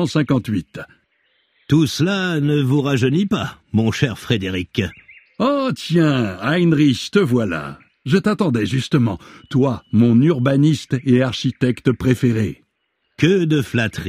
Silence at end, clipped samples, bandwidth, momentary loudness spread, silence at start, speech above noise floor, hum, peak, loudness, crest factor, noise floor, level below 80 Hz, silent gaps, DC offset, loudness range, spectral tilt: 0 s; under 0.1%; 15 kHz; 8 LU; 0 s; 53 dB; none; -2 dBFS; -18 LUFS; 16 dB; -70 dBFS; -48 dBFS; none; under 0.1%; 3 LU; -6.5 dB/octave